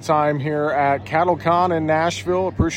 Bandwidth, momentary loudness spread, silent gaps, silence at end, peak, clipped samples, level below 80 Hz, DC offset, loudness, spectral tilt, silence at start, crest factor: 15.5 kHz; 3 LU; none; 0 s; -4 dBFS; under 0.1%; -40 dBFS; under 0.1%; -19 LUFS; -6 dB/octave; 0 s; 16 dB